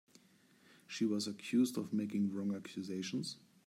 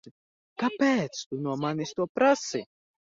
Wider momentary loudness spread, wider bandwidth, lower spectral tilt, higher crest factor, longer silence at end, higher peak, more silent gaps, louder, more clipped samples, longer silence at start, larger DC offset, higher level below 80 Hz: about the same, 9 LU vs 10 LU; first, 15.5 kHz vs 7.8 kHz; about the same, -5 dB/octave vs -5 dB/octave; about the same, 16 dB vs 18 dB; about the same, 0.3 s vs 0.4 s; second, -22 dBFS vs -10 dBFS; second, none vs 0.11-0.56 s, 1.26-1.31 s, 2.09-2.15 s; second, -38 LUFS vs -28 LUFS; neither; first, 0.9 s vs 0.05 s; neither; second, -86 dBFS vs -70 dBFS